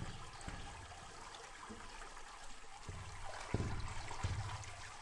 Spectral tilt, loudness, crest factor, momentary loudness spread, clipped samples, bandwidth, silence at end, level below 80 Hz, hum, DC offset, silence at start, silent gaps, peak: -4.5 dB/octave; -48 LUFS; 26 dB; 10 LU; under 0.1%; 11.5 kHz; 0 s; -52 dBFS; none; under 0.1%; 0 s; none; -20 dBFS